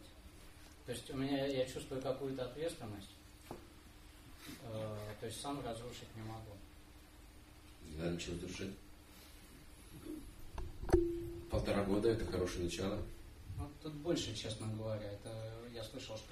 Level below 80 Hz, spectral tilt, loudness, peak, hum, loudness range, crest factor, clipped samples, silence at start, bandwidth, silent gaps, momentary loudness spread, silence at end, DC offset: -54 dBFS; -5.5 dB/octave; -42 LUFS; -16 dBFS; none; 9 LU; 26 dB; under 0.1%; 0 s; 15.5 kHz; none; 22 LU; 0 s; under 0.1%